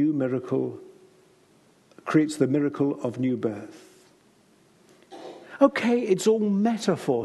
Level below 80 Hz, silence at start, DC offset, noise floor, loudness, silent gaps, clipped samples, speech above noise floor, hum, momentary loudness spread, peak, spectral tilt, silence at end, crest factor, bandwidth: -74 dBFS; 0 s; under 0.1%; -59 dBFS; -24 LUFS; none; under 0.1%; 36 dB; none; 20 LU; -6 dBFS; -6.5 dB/octave; 0 s; 20 dB; 12.5 kHz